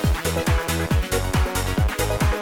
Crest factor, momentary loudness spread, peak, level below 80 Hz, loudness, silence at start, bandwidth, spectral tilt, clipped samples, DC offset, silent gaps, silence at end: 12 dB; 1 LU; -10 dBFS; -26 dBFS; -22 LUFS; 0 s; 19.5 kHz; -5 dB/octave; under 0.1%; under 0.1%; none; 0 s